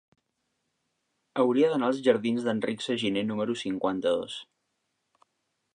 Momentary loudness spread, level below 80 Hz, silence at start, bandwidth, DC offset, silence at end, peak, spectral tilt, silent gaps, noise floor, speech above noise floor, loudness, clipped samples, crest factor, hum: 7 LU; -72 dBFS; 1.35 s; 10 kHz; under 0.1%; 1.35 s; -10 dBFS; -5.5 dB/octave; none; -79 dBFS; 52 dB; -27 LUFS; under 0.1%; 20 dB; none